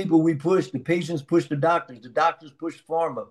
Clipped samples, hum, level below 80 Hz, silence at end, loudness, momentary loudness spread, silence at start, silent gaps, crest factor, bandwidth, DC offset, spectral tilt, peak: under 0.1%; none; -70 dBFS; 0.05 s; -24 LUFS; 10 LU; 0 s; none; 16 dB; 10.5 kHz; under 0.1%; -7 dB/octave; -8 dBFS